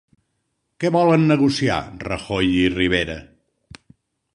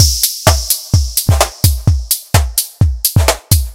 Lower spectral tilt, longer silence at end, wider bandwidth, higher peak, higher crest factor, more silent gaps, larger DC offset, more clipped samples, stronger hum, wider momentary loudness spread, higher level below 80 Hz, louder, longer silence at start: first, -6 dB/octave vs -3.5 dB/octave; first, 1.1 s vs 0 s; second, 11 kHz vs over 20 kHz; second, -4 dBFS vs 0 dBFS; first, 18 dB vs 12 dB; neither; second, under 0.1% vs 0.2%; second, under 0.1% vs 0.5%; neither; first, 13 LU vs 4 LU; second, -44 dBFS vs -18 dBFS; second, -19 LUFS vs -13 LUFS; first, 0.8 s vs 0 s